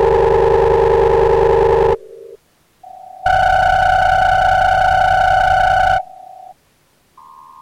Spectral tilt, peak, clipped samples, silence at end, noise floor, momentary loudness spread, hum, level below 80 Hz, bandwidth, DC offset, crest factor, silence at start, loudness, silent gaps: -5.5 dB/octave; 0 dBFS; under 0.1%; 1.1 s; -56 dBFS; 4 LU; none; -30 dBFS; 13.5 kHz; under 0.1%; 14 dB; 0 s; -13 LUFS; none